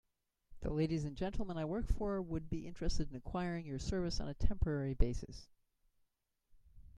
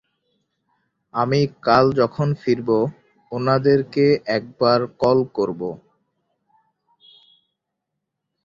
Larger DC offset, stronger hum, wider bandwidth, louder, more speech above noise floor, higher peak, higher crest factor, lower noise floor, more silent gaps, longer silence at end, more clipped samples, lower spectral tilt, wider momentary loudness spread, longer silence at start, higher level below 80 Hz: neither; neither; first, 9.8 kHz vs 7.2 kHz; second, -40 LUFS vs -20 LUFS; second, 44 dB vs 61 dB; second, -16 dBFS vs -2 dBFS; about the same, 20 dB vs 20 dB; about the same, -81 dBFS vs -80 dBFS; neither; second, 0 s vs 2.7 s; neither; about the same, -6.5 dB/octave vs -7.5 dB/octave; second, 6 LU vs 11 LU; second, 0.5 s vs 1.15 s; first, -44 dBFS vs -56 dBFS